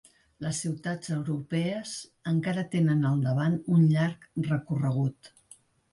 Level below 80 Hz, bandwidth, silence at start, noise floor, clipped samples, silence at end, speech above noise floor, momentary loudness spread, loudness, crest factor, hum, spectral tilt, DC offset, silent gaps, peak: -64 dBFS; 11.5 kHz; 0.4 s; -58 dBFS; under 0.1%; 0.65 s; 31 dB; 10 LU; -28 LUFS; 14 dB; none; -6.5 dB/octave; under 0.1%; none; -14 dBFS